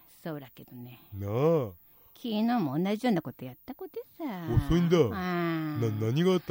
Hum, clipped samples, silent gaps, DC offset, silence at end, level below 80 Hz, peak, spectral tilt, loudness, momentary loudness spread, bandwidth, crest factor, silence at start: none; under 0.1%; none; under 0.1%; 0 s; -48 dBFS; -12 dBFS; -7.5 dB/octave; -29 LUFS; 18 LU; 16 kHz; 18 dB; 0.25 s